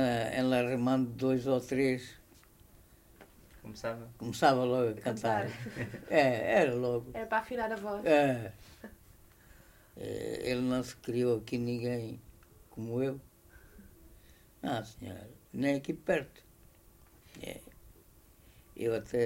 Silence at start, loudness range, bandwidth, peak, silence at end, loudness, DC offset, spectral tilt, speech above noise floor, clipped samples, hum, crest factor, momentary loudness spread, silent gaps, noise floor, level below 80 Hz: 0 s; 9 LU; 16 kHz; -12 dBFS; 0 s; -32 LUFS; under 0.1%; -6 dB/octave; 28 dB; under 0.1%; none; 22 dB; 19 LU; none; -60 dBFS; -62 dBFS